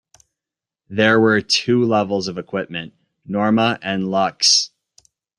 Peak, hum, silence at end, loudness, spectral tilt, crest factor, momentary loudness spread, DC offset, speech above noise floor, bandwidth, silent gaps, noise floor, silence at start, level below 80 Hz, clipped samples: -2 dBFS; none; 0.7 s; -17 LUFS; -3.5 dB/octave; 18 dB; 15 LU; under 0.1%; 70 dB; 11 kHz; none; -88 dBFS; 0.9 s; -60 dBFS; under 0.1%